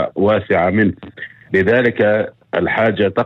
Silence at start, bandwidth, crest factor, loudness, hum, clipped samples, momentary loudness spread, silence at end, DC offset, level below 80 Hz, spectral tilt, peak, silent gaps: 0 s; 6.2 kHz; 14 dB; -16 LUFS; none; under 0.1%; 10 LU; 0 s; under 0.1%; -50 dBFS; -8.5 dB/octave; -2 dBFS; none